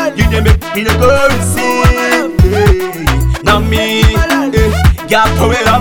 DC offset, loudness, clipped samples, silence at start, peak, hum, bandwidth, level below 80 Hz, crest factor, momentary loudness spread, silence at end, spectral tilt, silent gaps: under 0.1%; -10 LUFS; 1%; 0 s; 0 dBFS; none; 20 kHz; -16 dBFS; 10 dB; 4 LU; 0 s; -5.5 dB/octave; none